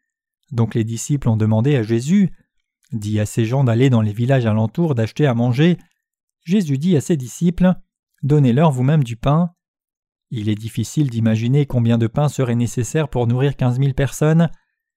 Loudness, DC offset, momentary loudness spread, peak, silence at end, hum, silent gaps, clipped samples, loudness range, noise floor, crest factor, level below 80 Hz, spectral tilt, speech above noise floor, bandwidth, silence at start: -18 LUFS; under 0.1%; 8 LU; -4 dBFS; 0.4 s; none; 6.23-6.28 s, 7.99-8.03 s, 9.68-9.74 s, 9.97-10.03 s; under 0.1%; 2 LU; -64 dBFS; 14 dB; -42 dBFS; -7.5 dB/octave; 48 dB; 14 kHz; 0.5 s